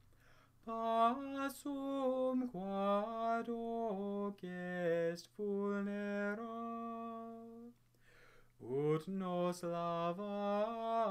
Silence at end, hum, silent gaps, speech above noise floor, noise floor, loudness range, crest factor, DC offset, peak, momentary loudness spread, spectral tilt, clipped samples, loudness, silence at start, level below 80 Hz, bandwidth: 0 s; none; none; 26 dB; -67 dBFS; 5 LU; 18 dB; under 0.1%; -22 dBFS; 10 LU; -6.5 dB/octave; under 0.1%; -39 LUFS; 0.3 s; -74 dBFS; 15.5 kHz